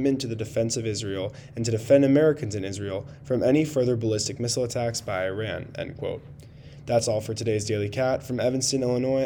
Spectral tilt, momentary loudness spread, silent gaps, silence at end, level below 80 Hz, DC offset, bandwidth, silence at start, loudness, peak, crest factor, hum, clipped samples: -5 dB/octave; 12 LU; none; 0 s; -54 dBFS; under 0.1%; 19 kHz; 0 s; -26 LUFS; -6 dBFS; 20 dB; none; under 0.1%